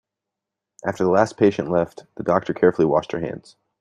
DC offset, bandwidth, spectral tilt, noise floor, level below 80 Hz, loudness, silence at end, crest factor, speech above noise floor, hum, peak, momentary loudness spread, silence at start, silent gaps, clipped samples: under 0.1%; 10.5 kHz; -7 dB/octave; -85 dBFS; -58 dBFS; -21 LUFS; 0.4 s; 18 dB; 64 dB; none; -2 dBFS; 12 LU; 0.85 s; none; under 0.1%